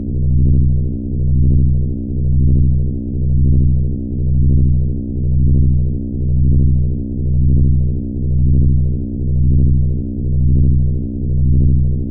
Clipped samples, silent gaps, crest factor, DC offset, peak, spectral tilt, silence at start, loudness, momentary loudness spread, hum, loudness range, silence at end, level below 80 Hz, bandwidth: under 0.1%; none; 8 dB; under 0.1%; -4 dBFS; -22 dB/octave; 0 s; -16 LUFS; 7 LU; none; 0 LU; 0 s; -16 dBFS; 0.8 kHz